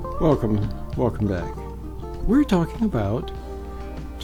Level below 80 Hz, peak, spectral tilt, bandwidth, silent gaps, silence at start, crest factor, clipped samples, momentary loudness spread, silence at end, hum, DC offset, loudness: -32 dBFS; -6 dBFS; -8 dB/octave; 18.5 kHz; none; 0 s; 18 dB; under 0.1%; 15 LU; 0 s; none; 0.2%; -23 LUFS